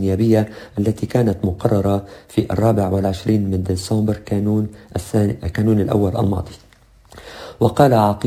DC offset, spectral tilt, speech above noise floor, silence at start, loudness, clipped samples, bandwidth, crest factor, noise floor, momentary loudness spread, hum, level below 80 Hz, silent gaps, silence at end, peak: under 0.1%; -7.5 dB/octave; 30 dB; 0 s; -19 LUFS; under 0.1%; 16 kHz; 18 dB; -47 dBFS; 10 LU; none; -36 dBFS; none; 0 s; 0 dBFS